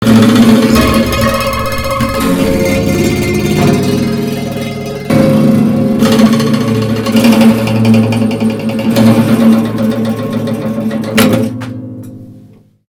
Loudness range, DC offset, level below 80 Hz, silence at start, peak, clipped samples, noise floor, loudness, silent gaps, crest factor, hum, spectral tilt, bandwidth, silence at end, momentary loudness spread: 3 LU; under 0.1%; -32 dBFS; 0 s; 0 dBFS; 0.7%; -39 dBFS; -10 LUFS; none; 10 dB; none; -6 dB/octave; 18.5 kHz; 0.55 s; 10 LU